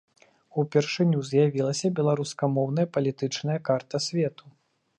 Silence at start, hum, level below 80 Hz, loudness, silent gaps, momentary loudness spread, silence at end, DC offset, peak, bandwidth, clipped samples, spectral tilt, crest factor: 0.55 s; none; -74 dBFS; -26 LUFS; none; 6 LU; 0.7 s; under 0.1%; -10 dBFS; 10.5 kHz; under 0.1%; -6 dB/octave; 18 dB